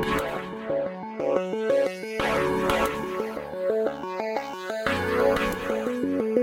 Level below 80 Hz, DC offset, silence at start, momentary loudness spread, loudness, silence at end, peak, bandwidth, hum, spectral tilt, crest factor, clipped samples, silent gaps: -48 dBFS; under 0.1%; 0 s; 8 LU; -27 LUFS; 0 s; -8 dBFS; 16.5 kHz; none; -5 dB/octave; 18 dB; under 0.1%; none